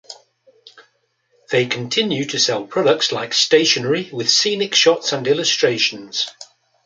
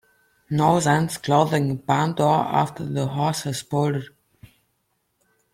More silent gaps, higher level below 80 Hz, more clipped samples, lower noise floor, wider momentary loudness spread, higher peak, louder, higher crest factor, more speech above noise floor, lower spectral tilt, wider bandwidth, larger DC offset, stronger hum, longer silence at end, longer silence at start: neither; second, -68 dBFS vs -58 dBFS; neither; second, -64 dBFS vs -72 dBFS; about the same, 7 LU vs 7 LU; about the same, -2 dBFS vs -4 dBFS; first, -17 LUFS vs -22 LUFS; about the same, 18 dB vs 18 dB; second, 46 dB vs 50 dB; second, -2.5 dB/octave vs -6 dB/octave; second, 9.4 kHz vs 15.5 kHz; neither; neither; second, 0.4 s vs 1.45 s; second, 0.1 s vs 0.5 s